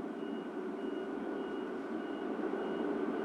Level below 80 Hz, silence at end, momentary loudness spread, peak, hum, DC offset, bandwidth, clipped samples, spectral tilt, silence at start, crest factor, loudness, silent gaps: -74 dBFS; 0 s; 4 LU; -24 dBFS; none; under 0.1%; 10.5 kHz; under 0.1%; -7 dB/octave; 0 s; 14 dB; -39 LUFS; none